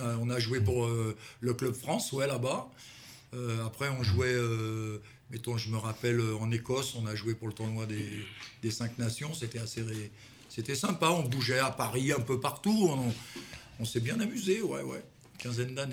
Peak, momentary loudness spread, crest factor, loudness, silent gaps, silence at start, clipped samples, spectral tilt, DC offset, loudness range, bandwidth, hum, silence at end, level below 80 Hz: -12 dBFS; 14 LU; 22 dB; -33 LUFS; none; 0 s; under 0.1%; -5 dB/octave; under 0.1%; 5 LU; 17 kHz; none; 0 s; -62 dBFS